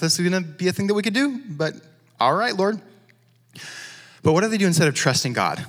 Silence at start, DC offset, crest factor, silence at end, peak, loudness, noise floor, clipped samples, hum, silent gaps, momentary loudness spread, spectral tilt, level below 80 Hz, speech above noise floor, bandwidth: 0 s; under 0.1%; 18 dB; 0 s; -4 dBFS; -21 LUFS; -58 dBFS; under 0.1%; none; none; 17 LU; -4.5 dB/octave; -66 dBFS; 37 dB; over 20 kHz